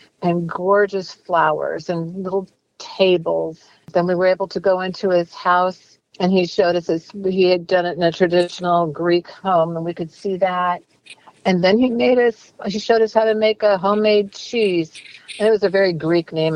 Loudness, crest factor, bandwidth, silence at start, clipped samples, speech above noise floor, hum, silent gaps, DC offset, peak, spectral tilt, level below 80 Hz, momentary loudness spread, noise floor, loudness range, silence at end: -19 LUFS; 16 dB; 10.5 kHz; 0.2 s; under 0.1%; 27 dB; none; none; under 0.1%; -2 dBFS; -6.5 dB/octave; -60 dBFS; 10 LU; -45 dBFS; 3 LU; 0 s